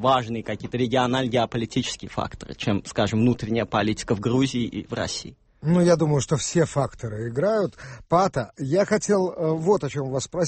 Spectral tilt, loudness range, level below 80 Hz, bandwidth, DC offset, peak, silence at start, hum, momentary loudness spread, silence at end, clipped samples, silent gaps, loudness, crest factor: -5.5 dB/octave; 2 LU; -50 dBFS; 8.8 kHz; under 0.1%; -6 dBFS; 0 s; none; 9 LU; 0 s; under 0.1%; none; -24 LUFS; 18 dB